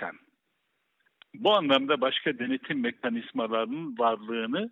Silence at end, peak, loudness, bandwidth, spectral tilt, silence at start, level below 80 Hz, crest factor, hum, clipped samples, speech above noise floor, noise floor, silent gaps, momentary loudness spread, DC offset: 0 s; -10 dBFS; -28 LUFS; 7.4 kHz; -6.5 dB/octave; 0 s; -82 dBFS; 18 dB; none; under 0.1%; 49 dB; -77 dBFS; none; 8 LU; under 0.1%